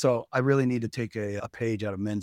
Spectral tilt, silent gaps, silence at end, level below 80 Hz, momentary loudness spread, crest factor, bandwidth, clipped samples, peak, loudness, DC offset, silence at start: -7 dB/octave; none; 0 s; -64 dBFS; 8 LU; 18 dB; 13 kHz; under 0.1%; -10 dBFS; -28 LUFS; under 0.1%; 0 s